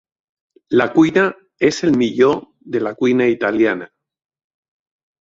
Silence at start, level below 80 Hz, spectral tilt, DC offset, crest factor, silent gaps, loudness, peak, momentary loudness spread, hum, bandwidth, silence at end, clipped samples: 0.7 s; -58 dBFS; -6 dB/octave; under 0.1%; 16 dB; none; -17 LUFS; -2 dBFS; 9 LU; none; 7.8 kHz; 1.35 s; under 0.1%